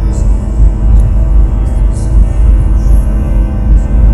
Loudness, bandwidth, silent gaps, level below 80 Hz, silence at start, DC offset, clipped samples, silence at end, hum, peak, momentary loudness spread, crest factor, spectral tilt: -11 LUFS; 8.4 kHz; none; -8 dBFS; 0 s; under 0.1%; 2%; 0 s; none; 0 dBFS; 3 LU; 6 dB; -8.5 dB/octave